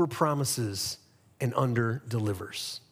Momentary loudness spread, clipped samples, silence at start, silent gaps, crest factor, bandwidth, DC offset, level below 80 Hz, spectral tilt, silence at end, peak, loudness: 8 LU; under 0.1%; 0 s; none; 18 dB; 16.5 kHz; under 0.1%; -68 dBFS; -5 dB/octave; 0.15 s; -12 dBFS; -30 LUFS